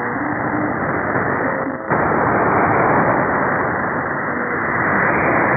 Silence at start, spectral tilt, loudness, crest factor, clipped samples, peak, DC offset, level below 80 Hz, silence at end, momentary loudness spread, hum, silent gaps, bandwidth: 0 s; -15.5 dB/octave; -17 LUFS; 16 dB; under 0.1%; -2 dBFS; under 0.1%; -44 dBFS; 0 s; 6 LU; none; none; 2.7 kHz